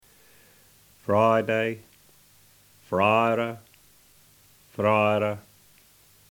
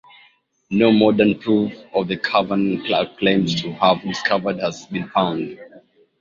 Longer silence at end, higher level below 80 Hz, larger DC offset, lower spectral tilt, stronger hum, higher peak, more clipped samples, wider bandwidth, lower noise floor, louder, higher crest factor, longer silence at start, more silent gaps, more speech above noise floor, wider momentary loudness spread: first, 0.9 s vs 0.4 s; second, -68 dBFS vs -56 dBFS; neither; about the same, -6.5 dB/octave vs -6 dB/octave; neither; second, -8 dBFS vs -2 dBFS; neither; first, 19.5 kHz vs 7.6 kHz; about the same, -57 dBFS vs -56 dBFS; second, -24 LUFS vs -19 LUFS; about the same, 20 dB vs 18 dB; first, 1.1 s vs 0.7 s; neither; about the same, 35 dB vs 37 dB; first, 18 LU vs 10 LU